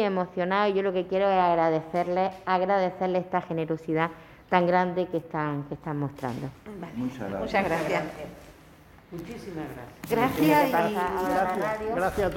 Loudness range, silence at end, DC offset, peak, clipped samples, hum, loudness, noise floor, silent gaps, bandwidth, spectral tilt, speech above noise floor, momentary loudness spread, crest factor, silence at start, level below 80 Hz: 6 LU; 0 s; under 0.1%; -6 dBFS; under 0.1%; none; -27 LUFS; -52 dBFS; none; 17 kHz; -6.5 dB/octave; 26 dB; 15 LU; 20 dB; 0 s; -54 dBFS